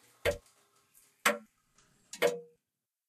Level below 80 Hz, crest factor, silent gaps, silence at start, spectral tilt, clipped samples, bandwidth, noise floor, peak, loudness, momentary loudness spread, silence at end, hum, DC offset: -60 dBFS; 26 dB; none; 0.25 s; -2.5 dB/octave; under 0.1%; 14 kHz; -89 dBFS; -12 dBFS; -34 LUFS; 14 LU; 0.65 s; none; under 0.1%